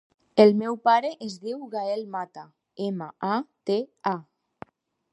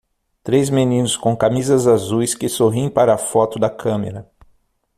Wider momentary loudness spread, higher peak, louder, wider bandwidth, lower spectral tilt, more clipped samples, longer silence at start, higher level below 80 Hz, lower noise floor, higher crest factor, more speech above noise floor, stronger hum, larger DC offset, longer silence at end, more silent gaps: first, 16 LU vs 7 LU; about the same, -2 dBFS vs 0 dBFS; second, -26 LUFS vs -17 LUFS; second, 10.5 kHz vs 15 kHz; about the same, -6.5 dB/octave vs -5.5 dB/octave; neither; about the same, 0.35 s vs 0.45 s; second, -76 dBFS vs -52 dBFS; second, -48 dBFS vs -58 dBFS; first, 24 dB vs 16 dB; second, 24 dB vs 42 dB; neither; neither; first, 0.9 s vs 0.75 s; neither